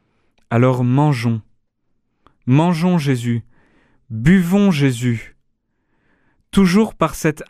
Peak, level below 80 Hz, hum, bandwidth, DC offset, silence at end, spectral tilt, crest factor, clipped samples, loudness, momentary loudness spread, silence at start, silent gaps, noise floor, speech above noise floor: -2 dBFS; -42 dBFS; none; 14.5 kHz; under 0.1%; 0.05 s; -7 dB/octave; 16 dB; under 0.1%; -17 LUFS; 10 LU; 0.5 s; none; -67 dBFS; 51 dB